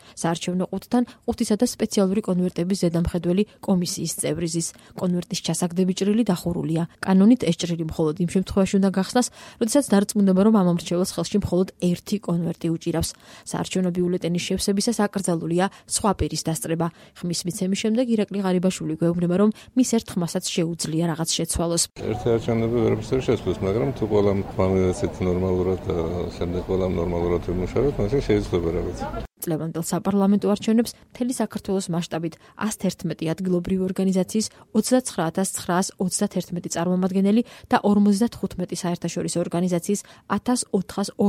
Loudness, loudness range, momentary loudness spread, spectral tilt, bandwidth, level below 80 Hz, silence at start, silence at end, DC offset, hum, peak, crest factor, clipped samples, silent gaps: -23 LUFS; 3 LU; 7 LU; -5.5 dB/octave; 15.5 kHz; -44 dBFS; 0.05 s; 0 s; under 0.1%; none; -6 dBFS; 18 dB; under 0.1%; none